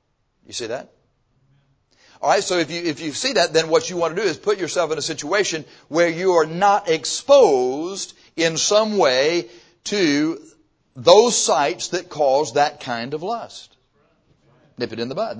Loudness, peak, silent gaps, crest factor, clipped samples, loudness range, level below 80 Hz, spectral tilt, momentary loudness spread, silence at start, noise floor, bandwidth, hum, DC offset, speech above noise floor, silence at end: -19 LUFS; 0 dBFS; none; 20 dB; under 0.1%; 6 LU; -64 dBFS; -3 dB/octave; 16 LU; 0.5 s; -63 dBFS; 8 kHz; none; under 0.1%; 44 dB; 0 s